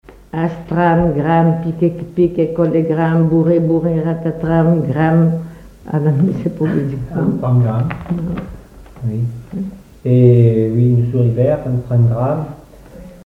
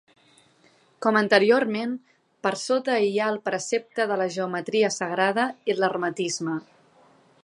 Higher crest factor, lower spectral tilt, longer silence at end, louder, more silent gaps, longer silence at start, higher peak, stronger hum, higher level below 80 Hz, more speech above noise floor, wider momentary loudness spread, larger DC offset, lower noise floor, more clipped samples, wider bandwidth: second, 14 dB vs 22 dB; first, -10.5 dB/octave vs -4 dB/octave; second, 0.05 s vs 0.85 s; first, -15 LUFS vs -24 LUFS; neither; second, 0.35 s vs 1 s; first, 0 dBFS vs -4 dBFS; neither; first, -40 dBFS vs -78 dBFS; second, 22 dB vs 36 dB; about the same, 11 LU vs 10 LU; neither; second, -37 dBFS vs -60 dBFS; neither; second, 4 kHz vs 11.5 kHz